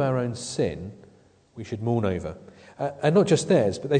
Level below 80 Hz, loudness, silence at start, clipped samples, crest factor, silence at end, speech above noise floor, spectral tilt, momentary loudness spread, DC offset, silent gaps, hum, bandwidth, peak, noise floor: -56 dBFS; -24 LUFS; 0 s; under 0.1%; 18 dB; 0 s; 32 dB; -6 dB/octave; 18 LU; under 0.1%; none; none; 9.4 kHz; -8 dBFS; -56 dBFS